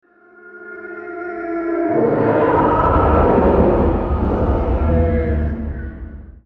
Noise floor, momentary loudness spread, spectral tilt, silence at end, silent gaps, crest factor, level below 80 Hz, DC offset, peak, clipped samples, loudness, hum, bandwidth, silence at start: -44 dBFS; 18 LU; -11 dB/octave; 0.05 s; none; 14 dB; -24 dBFS; under 0.1%; -2 dBFS; under 0.1%; -17 LUFS; none; 4.4 kHz; 0.45 s